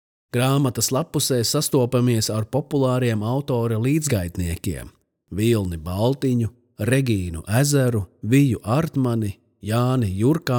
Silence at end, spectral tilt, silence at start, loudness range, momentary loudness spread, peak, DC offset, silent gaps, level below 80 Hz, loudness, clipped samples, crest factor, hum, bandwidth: 0 s; -5.5 dB/octave; 0.35 s; 3 LU; 8 LU; -6 dBFS; under 0.1%; none; -50 dBFS; -22 LUFS; under 0.1%; 16 dB; none; over 20 kHz